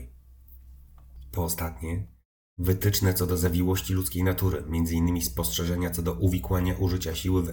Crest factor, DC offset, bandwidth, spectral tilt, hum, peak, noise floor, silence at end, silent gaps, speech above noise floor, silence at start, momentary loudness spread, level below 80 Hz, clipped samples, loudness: 18 dB; under 0.1%; over 20 kHz; -5.5 dB/octave; none; -10 dBFS; -50 dBFS; 0 s; 2.25-2.56 s; 24 dB; 0 s; 8 LU; -40 dBFS; under 0.1%; -27 LUFS